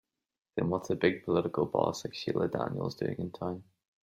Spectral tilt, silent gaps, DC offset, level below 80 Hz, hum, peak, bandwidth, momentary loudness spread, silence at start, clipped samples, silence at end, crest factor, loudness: -6.5 dB/octave; none; under 0.1%; -66 dBFS; none; -10 dBFS; 15.5 kHz; 9 LU; 0.55 s; under 0.1%; 0.45 s; 24 dB; -32 LUFS